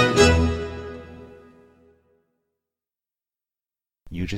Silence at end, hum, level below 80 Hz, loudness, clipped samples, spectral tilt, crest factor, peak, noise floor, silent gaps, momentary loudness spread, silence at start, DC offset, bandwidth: 0 s; none; -36 dBFS; -20 LUFS; under 0.1%; -5 dB/octave; 22 dB; -2 dBFS; under -90 dBFS; none; 26 LU; 0 s; under 0.1%; 13.5 kHz